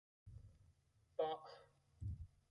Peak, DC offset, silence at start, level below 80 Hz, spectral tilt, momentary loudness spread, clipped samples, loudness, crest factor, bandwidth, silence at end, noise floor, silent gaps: -28 dBFS; under 0.1%; 0.25 s; -62 dBFS; -7.5 dB/octave; 20 LU; under 0.1%; -48 LUFS; 22 dB; 11 kHz; 0.25 s; -75 dBFS; none